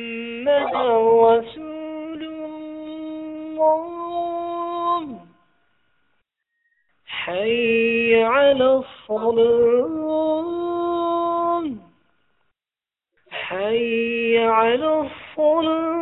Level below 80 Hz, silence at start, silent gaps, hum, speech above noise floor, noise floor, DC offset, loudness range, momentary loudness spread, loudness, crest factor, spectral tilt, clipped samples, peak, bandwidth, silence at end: -58 dBFS; 0 s; none; none; over 72 dB; under -90 dBFS; under 0.1%; 8 LU; 16 LU; -20 LUFS; 18 dB; -8 dB/octave; under 0.1%; -4 dBFS; 4.1 kHz; 0 s